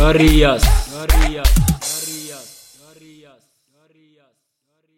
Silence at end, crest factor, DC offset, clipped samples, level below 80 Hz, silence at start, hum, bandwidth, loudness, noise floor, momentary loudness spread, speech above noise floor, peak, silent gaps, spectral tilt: 2.55 s; 16 dB; under 0.1%; under 0.1%; -20 dBFS; 0 s; none; 16.5 kHz; -16 LUFS; -71 dBFS; 19 LU; 59 dB; 0 dBFS; none; -4.5 dB/octave